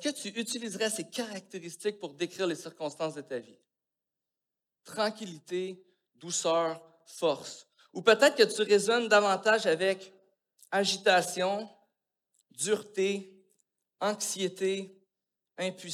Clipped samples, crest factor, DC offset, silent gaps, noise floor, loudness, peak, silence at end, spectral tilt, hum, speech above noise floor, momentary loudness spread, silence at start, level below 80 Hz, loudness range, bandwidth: under 0.1%; 24 dB; under 0.1%; none; -89 dBFS; -29 LUFS; -8 dBFS; 0 s; -2.5 dB/octave; none; 60 dB; 17 LU; 0 s; under -90 dBFS; 12 LU; 15.5 kHz